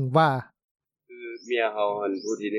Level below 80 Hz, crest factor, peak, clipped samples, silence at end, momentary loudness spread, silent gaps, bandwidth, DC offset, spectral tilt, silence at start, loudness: -76 dBFS; 18 dB; -8 dBFS; under 0.1%; 0 s; 18 LU; 0.64-0.75 s; 11 kHz; under 0.1%; -6 dB/octave; 0 s; -26 LUFS